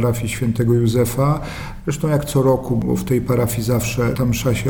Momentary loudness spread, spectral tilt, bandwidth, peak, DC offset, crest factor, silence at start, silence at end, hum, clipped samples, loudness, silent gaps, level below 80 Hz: 6 LU; -6.5 dB/octave; over 20 kHz; -4 dBFS; under 0.1%; 14 dB; 0 s; 0 s; none; under 0.1%; -19 LUFS; none; -36 dBFS